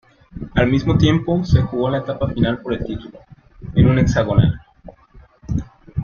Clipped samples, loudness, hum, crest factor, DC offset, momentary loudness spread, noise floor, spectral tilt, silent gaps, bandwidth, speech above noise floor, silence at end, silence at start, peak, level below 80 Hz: under 0.1%; -18 LUFS; none; 18 dB; under 0.1%; 14 LU; -47 dBFS; -7.5 dB/octave; none; 7 kHz; 31 dB; 0 s; 0.35 s; -2 dBFS; -34 dBFS